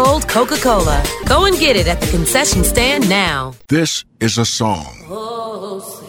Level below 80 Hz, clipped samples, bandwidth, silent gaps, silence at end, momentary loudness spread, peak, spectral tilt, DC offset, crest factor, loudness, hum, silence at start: -26 dBFS; under 0.1%; 17.5 kHz; none; 0 s; 13 LU; 0 dBFS; -3.5 dB/octave; under 0.1%; 14 dB; -14 LUFS; none; 0 s